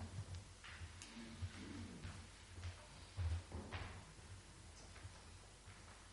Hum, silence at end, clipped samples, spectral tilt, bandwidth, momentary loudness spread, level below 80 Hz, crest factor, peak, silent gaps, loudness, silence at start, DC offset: none; 0 s; under 0.1%; -4.5 dB/octave; 11.5 kHz; 11 LU; -58 dBFS; 20 dB; -32 dBFS; none; -53 LUFS; 0 s; under 0.1%